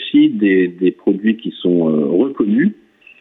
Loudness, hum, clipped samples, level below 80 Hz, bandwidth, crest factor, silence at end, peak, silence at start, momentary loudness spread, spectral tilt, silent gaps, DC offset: -15 LUFS; none; under 0.1%; -62 dBFS; 4 kHz; 12 dB; 0.45 s; -4 dBFS; 0 s; 5 LU; -10 dB/octave; none; under 0.1%